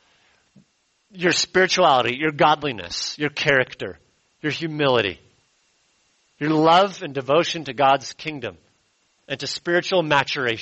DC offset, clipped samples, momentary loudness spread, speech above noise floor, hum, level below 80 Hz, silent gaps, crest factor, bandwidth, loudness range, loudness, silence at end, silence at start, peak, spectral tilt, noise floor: under 0.1%; under 0.1%; 14 LU; 45 dB; none; -60 dBFS; none; 18 dB; 8.2 kHz; 4 LU; -20 LUFS; 0 s; 1.15 s; -4 dBFS; -4 dB/octave; -65 dBFS